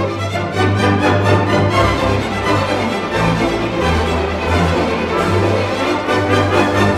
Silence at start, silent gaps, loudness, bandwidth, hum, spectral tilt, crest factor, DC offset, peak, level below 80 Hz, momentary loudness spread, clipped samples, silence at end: 0 s; none; -15 LUFS; 13.5 kHz; none; -6 dB/octave; 14 dB; under 0.1%; 0 dBFS; -30 dBFS; 4 LU; under 0.1%; 0 s